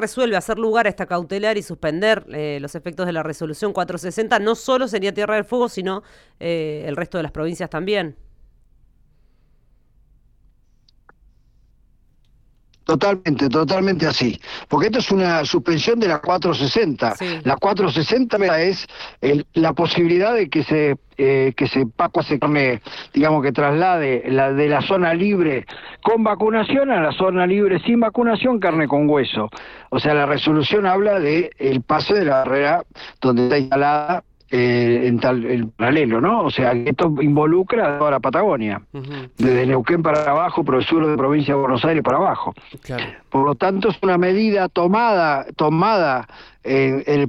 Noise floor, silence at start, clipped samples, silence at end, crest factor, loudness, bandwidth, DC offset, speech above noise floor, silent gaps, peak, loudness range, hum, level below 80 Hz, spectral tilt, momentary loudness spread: -55 dBFS; 0 s; under 0.1%; 0 s; 14 dB; -18 LUFS; 13 kHz; under 0.1%; 37 dB; none; -4 dBFS; 5 LU; none; -50 dBFS; -6.5 dB/octave; 9 LU